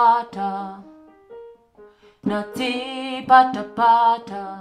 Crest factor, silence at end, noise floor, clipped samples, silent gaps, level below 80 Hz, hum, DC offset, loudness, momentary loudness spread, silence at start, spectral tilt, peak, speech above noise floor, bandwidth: 20 dB; 0 s; -50 dBFS; under 0.1%; none; -62 dBFS; none; under 0.1%; -20 LUFS; 15 LU; 0 s; -5 dB/octave; -2 dBFS; 30 dB; 14 kHz